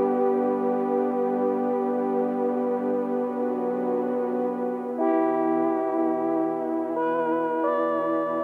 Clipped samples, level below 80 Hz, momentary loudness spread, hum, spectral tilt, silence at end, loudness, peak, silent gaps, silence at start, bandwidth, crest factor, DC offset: under 0.1%; -86 dBFS; 4 LU; none; -9 dB/octave; 0 s; -25 LUFS; -12 dBFS; none; 0 s; 4.2 kHz; 12 dB; under 0.1%